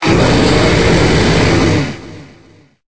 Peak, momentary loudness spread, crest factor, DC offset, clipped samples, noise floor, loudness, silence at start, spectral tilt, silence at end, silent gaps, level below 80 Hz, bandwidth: 0 dBFS; 7 LU; 12 dB; under 0.1%; under 0.1%; -45 dBFS; -11 LUFS; 0 s; -5.5 dB/octave; 0.1 s; none; -24 dBFS; 8 kHz